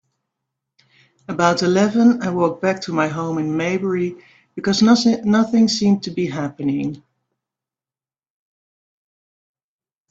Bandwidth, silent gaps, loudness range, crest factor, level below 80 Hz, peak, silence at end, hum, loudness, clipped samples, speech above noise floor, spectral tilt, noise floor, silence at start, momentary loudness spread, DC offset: 7.8 kHz; none; 10 LU; 20 dB; -60 dBFS; 0 dBFS; 3.15 s; none; -18 LUFS; under 0.1%; over 72 dB; -5.5 dB/octave; under -90 dBFS; 1.3 s; 11 LU; under 0.1%